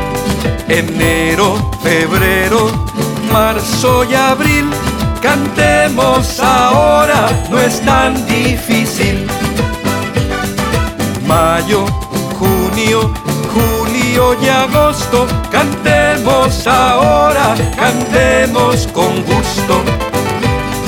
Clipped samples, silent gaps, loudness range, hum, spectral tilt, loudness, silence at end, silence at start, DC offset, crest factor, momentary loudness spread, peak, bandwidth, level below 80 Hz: under 0.1%; none; 4 LU; none; -4.5 dB/octave; -12 LUFS; 0 s; 0 s; under 0.1%; 12 dB; 6 LU; 0 dBFS; over 20 kHz; -26 dBFS